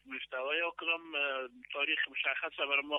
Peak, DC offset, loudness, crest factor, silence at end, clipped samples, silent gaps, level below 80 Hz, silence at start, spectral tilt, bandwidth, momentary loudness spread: -18 dBFS; under 0.1%; -34 LUFS; 18 dB; 0 s; under 0.1%; none; -80 dBFS; 0.05 s; -3 dB/octave; 4 kHz; 8 LU